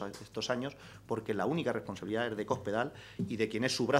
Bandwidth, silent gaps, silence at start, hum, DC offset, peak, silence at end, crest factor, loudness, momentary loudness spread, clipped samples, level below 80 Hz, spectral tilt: 15.5 kHz; none; 0 s; none; under 0.1%; -12 dBFS; 0 s; 24 dB; -35 LUFS; 8 LU; under 0.1%; -66 dBFS; -5 dB/octave